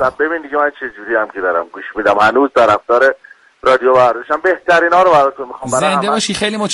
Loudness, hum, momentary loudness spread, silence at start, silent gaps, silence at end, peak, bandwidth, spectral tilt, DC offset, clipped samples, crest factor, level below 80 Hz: -13 LUFS; none; 8 LU; 0 s; none; 0 s; 0 dBFS; 11.5 kHz; -3.5 dB/octave; under 0.1%; under 0.1%; 12 dB; -50 dBFS